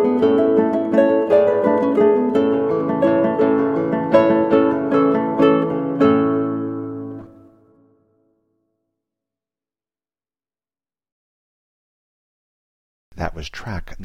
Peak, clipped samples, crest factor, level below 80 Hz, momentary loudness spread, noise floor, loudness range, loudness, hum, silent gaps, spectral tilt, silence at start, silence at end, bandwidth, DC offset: -2 dBFS; under 0.1%; 18 dB; -46 dBFS; 14 LU; under -90 dBFS; 19 LU; -17 LUFS; none; 11.12-13.11 s; -8 dB/octave; 0 s; 0 s; 7 kHz; under 0.1%